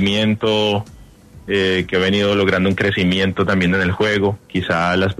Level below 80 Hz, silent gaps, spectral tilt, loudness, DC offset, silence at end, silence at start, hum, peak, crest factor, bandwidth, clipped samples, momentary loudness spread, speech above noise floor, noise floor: -46 dBFS; none; -6 dB/octave; -17 LUFS; under 0.1%; 0.05 s; 0 s; none; -2 dBFS; 14 dB; 12.5 kHz; under 0.1%; 5 LU; 25 dB; -42 dBFS